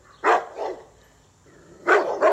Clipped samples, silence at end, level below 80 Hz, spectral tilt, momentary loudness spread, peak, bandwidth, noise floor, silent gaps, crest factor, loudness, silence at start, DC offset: under 0.1%; 0 s; -64 dBFS; -3.5 dB/octave; 14 LU; -4 dBFS; 12.5 kHz; -55 dBFS; none; 20 dB; -22 LUFS; 0.25 s; under 0.1%